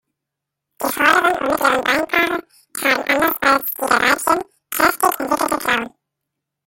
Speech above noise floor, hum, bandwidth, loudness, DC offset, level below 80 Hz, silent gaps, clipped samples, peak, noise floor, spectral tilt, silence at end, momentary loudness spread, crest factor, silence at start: 65 dB; none; 17 kHz; -17 LUFS; under 0.1%; -54 dBFS; none; under 0.1%; 0 dBFS; -82 dBFS; -2 dB/octave; 0.8 s; 8 LU; 18 dB; 0.8 s